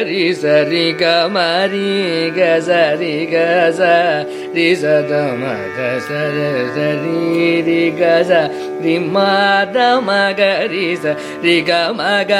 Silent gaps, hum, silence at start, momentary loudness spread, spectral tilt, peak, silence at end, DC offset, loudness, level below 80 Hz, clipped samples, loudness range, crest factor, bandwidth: none; none; 0 s; 6 LU; -5.5 dB/octave; 0 dBFS; 0 s; under 0.1%; -14 LUFS; -64 dBFS; under 0.1%; 3 LU; 14 dB; 13.5 kHz